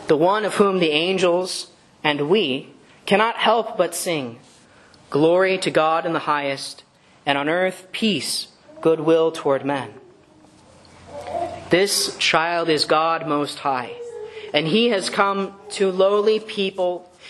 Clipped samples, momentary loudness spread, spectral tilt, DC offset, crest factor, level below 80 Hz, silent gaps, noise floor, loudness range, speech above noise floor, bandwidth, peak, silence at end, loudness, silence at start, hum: under 0.1%; 11 LU; -4 dB/octave; under 0.1%; 20 dB; -66 dBFS; none; -51 dBFS; 3 LU; 31 dB; 12.5 kHz; 0 dBFS; 0 s; -20 LUFS; 0 s; none